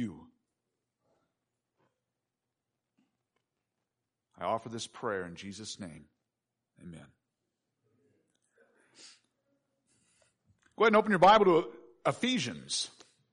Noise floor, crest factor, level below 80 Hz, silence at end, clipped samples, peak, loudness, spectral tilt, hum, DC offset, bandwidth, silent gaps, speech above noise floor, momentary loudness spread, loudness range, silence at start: -88 dBFS; 22 dB; -72 dBFS; 0.45 s; under 0.1%; -12 dBFS; -28 LUFS; -4 dB/octave; none; under 0.1%; 10.5 kHz; none; 59 dB; 22 LU; 20 LU; 0 s